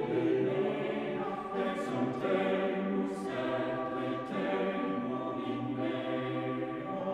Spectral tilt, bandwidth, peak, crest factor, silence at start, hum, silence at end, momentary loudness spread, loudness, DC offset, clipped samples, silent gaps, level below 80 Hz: -7.5 dB/octave; 11 kHz; -18 dBFS; 16 dB; 0 s; none; 0 s; 5 LU; -34 LUFS; under 0.1%; under 0.1%; none; -68 dBFS